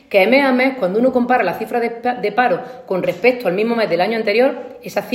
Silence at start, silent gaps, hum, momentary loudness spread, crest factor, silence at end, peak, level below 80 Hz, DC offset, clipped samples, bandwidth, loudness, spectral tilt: 0.1 s; none; none; 9 LU; 16 dB; 0 s; 0 dBFS; -62 dBFS; under 0.1%; under 0.1%; 16 kHz; -17 LUFS; -6 dB/octave